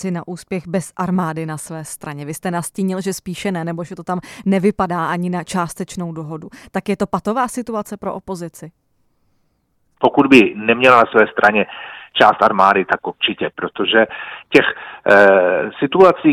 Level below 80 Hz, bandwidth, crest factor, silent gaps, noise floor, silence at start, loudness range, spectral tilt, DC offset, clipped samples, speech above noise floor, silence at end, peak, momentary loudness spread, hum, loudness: -54 dBFS; 15 kHz; 16 dB; none; -64 dBFS; 0 s; 11 LU; -5 dB/octave; under 0.1%; 0.1%; 47 dB; 0 s; 0 dBFS; 17 LU; none; -16 LUFS